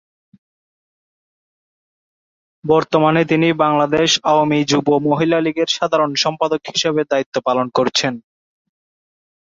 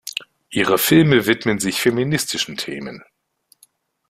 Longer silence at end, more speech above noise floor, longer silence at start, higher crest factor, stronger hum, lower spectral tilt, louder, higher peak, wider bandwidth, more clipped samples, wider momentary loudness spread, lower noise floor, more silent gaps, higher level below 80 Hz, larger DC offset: first, 1.25 s vs 1.1 s; first, over 74 dB vs 42 dB; first, 2.65 s vs 0.05 s; about the same, 18 dB vs 18 dB; neither; about the same, -4.5 dB/octave vs -4.5 dB/octave; about the same, -16 LUFS vs -18 LUFS; about the same, 0 dBFS vs -2 dBFS; second, 7.8 kHz vs 16 kHz; neither; second, 5 LU vs 16 LU; first, under -90 dBFS vs -60 dBFS; first, 7.26-7.32 s vs none; about the same, -58 dBFS vs -54 dBFS; neither